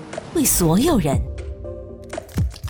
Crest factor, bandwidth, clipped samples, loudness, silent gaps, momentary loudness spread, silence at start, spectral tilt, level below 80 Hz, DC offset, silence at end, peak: 16 dB; over 20 kHz; under 0.1%; -19 LUFS; none; 18 LU; 0 s; -5 dB/octave; -32 dBFS; under 0.1%; 0 s; -6 dBFS